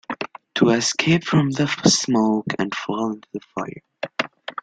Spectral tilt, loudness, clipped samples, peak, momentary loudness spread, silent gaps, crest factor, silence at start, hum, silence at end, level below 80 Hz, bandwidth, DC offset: -4.5 dB/octave; -21 LUFS; under 0.1%; -2 dBFS; 14 LU; none; 20 dB; 0.1 s; none; 0 s; -58 dBFS; 9.6 kHz; under 0.1%